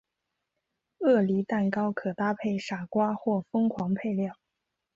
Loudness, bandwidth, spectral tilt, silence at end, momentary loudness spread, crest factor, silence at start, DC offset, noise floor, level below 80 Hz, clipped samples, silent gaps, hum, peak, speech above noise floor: -28 LUFS; 7.6 kHz; -8 dB/octave; 0.65 s; 7 LU; 16 dB; 1 s; under 0.1%; -84 dBFS; -70 dBFS; under 0.1%; none; none; -12 dBFS; 56 dB